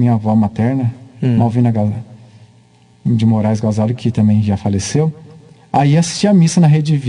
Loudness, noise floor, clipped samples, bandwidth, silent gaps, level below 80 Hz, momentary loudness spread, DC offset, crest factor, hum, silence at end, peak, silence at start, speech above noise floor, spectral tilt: -14 LUFS; -48 dBFS; under 0.1%; 10.5 kHz; none; -52 dBFS; 8 LU; under 0.1%; 12 dB; none; 0 s; -2 dBFS; 0 s; 35 dB; -7 dB/octave